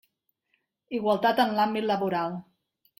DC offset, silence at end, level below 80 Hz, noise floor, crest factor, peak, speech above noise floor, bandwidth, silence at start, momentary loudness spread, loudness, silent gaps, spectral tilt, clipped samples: under 0.1%; 0.6 s; -72 dBFS; -75 dBFS; 16 dB; -12 dBFS; 50 dB; 16.5 kHz; 0.9 s; 11 LU; -26 LUFS; none; -6 dB/octave; under 0.1%